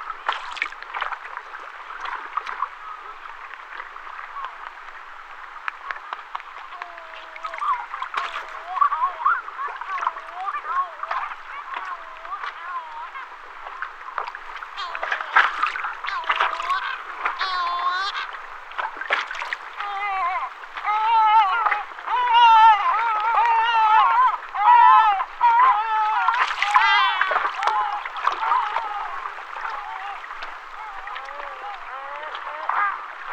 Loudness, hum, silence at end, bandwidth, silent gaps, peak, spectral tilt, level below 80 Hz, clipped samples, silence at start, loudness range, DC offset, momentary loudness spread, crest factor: -21 LUFS; none; 0 s; 8.8 kHz; none; -4 dBFS; 0.5 dB/octave; -56 dBFS; under 0.1%; 0 s; 16 LU; under 0.1%; 19 LU; 18 dB